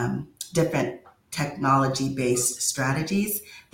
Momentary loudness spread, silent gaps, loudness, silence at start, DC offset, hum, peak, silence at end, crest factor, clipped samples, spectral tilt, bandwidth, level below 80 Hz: 10 LU; none; -25 LUFS; 0 s; under 0.1%; none; -8 dBFS; 0.15 s; 18 dB; under 0.1%; -4.5 dB/octave; 17 kHz; -56 dBFS